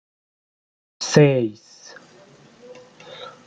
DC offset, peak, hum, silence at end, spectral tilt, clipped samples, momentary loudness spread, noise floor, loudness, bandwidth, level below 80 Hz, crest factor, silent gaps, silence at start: under 0.1%; -2 dBFS; none; 0.2 s; -5.5 dB/octave; under 0.1%; 27 LU; -50 dBFS; -18 LUFS; 9.2 kHz; -64 dBFS; 22 dB; none; 1 s